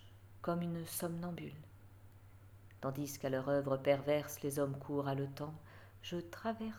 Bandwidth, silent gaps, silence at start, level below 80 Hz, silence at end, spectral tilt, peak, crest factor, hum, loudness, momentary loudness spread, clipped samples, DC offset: over 20 kHz; none; 0 s; -68 dBFS; 0 s; -6 dB/octave; -18 dBFS; 22 dB; none; -39 LUFS; 18 LU; under 0.1%; under 0.1%